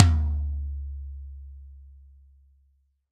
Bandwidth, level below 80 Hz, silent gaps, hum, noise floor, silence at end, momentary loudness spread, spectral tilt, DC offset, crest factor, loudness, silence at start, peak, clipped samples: 7.4 kHz; -32 dBFS; none; none; -66 dBFS; 1.2 s; 23 LU; -7 dB/octave; under 0.1%; 28 dB; -29 LUFS; 0 s; 0 dBFS; under 0.1%